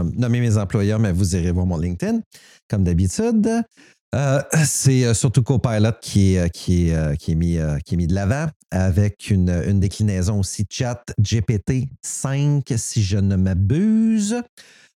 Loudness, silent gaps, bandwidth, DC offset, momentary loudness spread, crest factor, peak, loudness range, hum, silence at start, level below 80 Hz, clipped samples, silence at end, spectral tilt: -20 LUFS; 2.26-2.31 s, 2.62-2.70 s, 4.01-4.12 s, 8.56-8.60 s; 14.5 kHz; under 0.1%; 7 LU; 16 dB; -4 dBFS; 3 LU; none; 0 s; -36 dBFS; under 0.1%; 0.55 s; -6 dB/octave